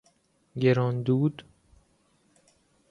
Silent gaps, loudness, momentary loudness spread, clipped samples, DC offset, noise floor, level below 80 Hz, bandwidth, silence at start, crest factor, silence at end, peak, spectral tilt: none; -26 LUFS; 17 LU; under 0.1%; under 0.1%; -67 dBFS; -66 dBFS; 6.8 kHz; 0.55 s; 20 dB; 1.5 s; -10 dBFS; -9 dB/octave